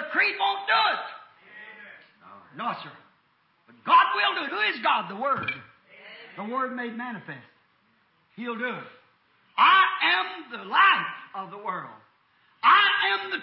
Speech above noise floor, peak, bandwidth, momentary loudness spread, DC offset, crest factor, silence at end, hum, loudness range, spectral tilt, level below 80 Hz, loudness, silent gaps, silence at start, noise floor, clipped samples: 42 dB; -8 dBFS; 5.8 kHz; 22 LU; under 0.1%; 20 dB; 0 s; none; 12 LU; -6.5 dB/octave; -78 dBFS; -23 LUFS; none; 0 s; -67 dBFS; under 0.1%